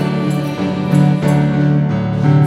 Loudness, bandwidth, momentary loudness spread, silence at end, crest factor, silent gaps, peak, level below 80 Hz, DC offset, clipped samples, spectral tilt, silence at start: -15 LUFS; 11 kHz; 5 LU; 0 s; 14 dB; none; 0 dBFS; -42 dBFS; 0.1%; under 0.1%; -8.5 dB/octave; 0 s